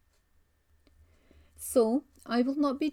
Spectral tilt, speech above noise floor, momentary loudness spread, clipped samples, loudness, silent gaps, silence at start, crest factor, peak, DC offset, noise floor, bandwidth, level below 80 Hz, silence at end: -4.5 dB/octave; 40 dB; 7 LU; under 0.1%; -29 LUFS; none; 1.6 s; 18 dB; -14 dBFS; under 0.1%; -68 dBFS; 18.5 kHz; -66 dBFS; 0 s